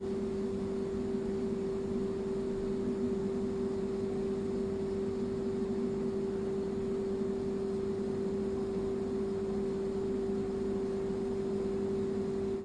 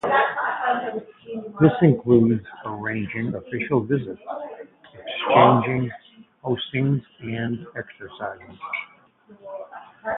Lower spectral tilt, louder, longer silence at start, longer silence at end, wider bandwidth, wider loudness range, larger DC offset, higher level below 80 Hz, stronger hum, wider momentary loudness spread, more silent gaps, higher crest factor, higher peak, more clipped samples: second, -8 dB/octave vs -10 dB/octave; second, -35 LUFS vs -22 LUFS; about the same, 0 s vs 0.05 s; about the same, 0 s vs 0 s; first, 10 kHz vs 4 kHz; second, 0 LU vs 7 LU; neither; about the same, -54 dBFS vs -58 dBFS; neither; second, 1 LU vs 21 LU; neither; second, 12 dB vs 22 dB; second, -22 dBFS vs 0 dBFS; neither